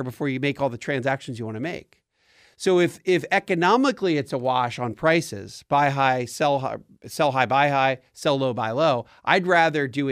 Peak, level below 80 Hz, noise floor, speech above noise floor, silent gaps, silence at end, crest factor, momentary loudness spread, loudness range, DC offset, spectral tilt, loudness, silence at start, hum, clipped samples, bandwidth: -2 dBFS; -64 dBFS; -59 dBFS; 36 dB; none; 0 s; 22 dB; 11 LU; 3 LU; under 0.1%; -5.5 dB/octave; -23 LUFS; 0 s; none; under 0.1%; 15.5 kHz